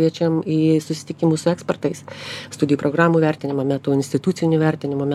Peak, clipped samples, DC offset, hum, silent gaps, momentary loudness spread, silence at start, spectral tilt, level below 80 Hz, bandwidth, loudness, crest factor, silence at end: -2 dBFS; under 0.1%; under 0.1%; none; none; 10 LU; 0 s; -6.5 dB/octave; -66 dBFS; 12.5 kHz; -20 LUFS; 18 dB; 0 s